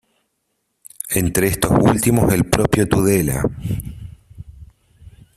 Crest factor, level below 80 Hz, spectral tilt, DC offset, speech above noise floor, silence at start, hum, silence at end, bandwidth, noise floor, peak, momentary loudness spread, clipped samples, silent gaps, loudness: 18 dB; -36 dBFS; -5.5 dB/octave; under 0.1%; 55 dB; 1.05 s; none; 0.25 s; 16 kHz; -71 dBFS; 0 dBFS; 15 LU; under 0.1%; none; -17 LUFS